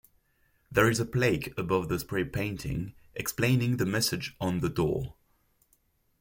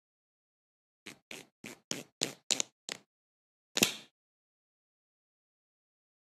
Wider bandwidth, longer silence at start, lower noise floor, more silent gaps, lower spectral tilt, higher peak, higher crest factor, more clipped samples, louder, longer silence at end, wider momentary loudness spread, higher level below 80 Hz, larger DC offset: first, 17 kHz vs 13.5 kHz; second, 0.7 s vs 1.05 s; second, -70 dBFS vs under -90 dBFS; second, none vs 1.22-1.31 s, 1.52-1.64 s, 1.84-1.91 s, 2.12-2.21 s, 2.43-2.50 s, 2.72-2.88 s, 3.06-3.75 s; first, -5 dB/octave vs -1 dB/octave; about the same, -8 dBFS vs -6 dBFS; second, 22 dB vs 36 dB; neither; first, -29 LUFS vs -34 LUFS; second, 1.1 s vs 2.3 s; second, 9 LU vs 21 LU; first, -52 dBFS vs -84 dBFS; neither